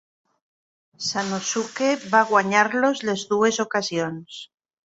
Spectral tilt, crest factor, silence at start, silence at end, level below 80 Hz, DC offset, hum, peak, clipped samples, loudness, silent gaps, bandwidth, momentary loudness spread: -3.5 dB/octave; 20 dB; 1 s; 0.4 s; -68 dBFS; under 0.1%; none; -2 dBFS; under 0.1%; -22 LUFS; none; 8.2 kHz; 12 LU